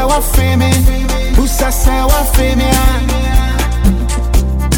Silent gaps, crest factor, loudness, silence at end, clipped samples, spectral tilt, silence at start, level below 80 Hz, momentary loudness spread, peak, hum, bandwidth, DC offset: none; 10 dB; -13 LUFS; 0 s; under 0.1%; -5 dB/octave; 0 s; -12 dBFS; 3 LU; 0 dBFS; none; 18.5 kHz; under 0.1%